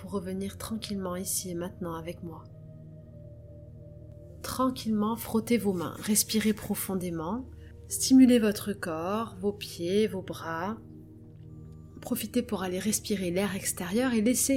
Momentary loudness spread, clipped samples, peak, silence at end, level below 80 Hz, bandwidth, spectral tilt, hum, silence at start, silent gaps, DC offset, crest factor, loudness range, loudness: 23 LU; under 0.1%; -10 dBFS; 0 s; -56 dBFS; 17 kHz; -4.5 dB/octave; none; 0 s; none; under 0.1%; 20 dB; 10 LU; -29 LUFS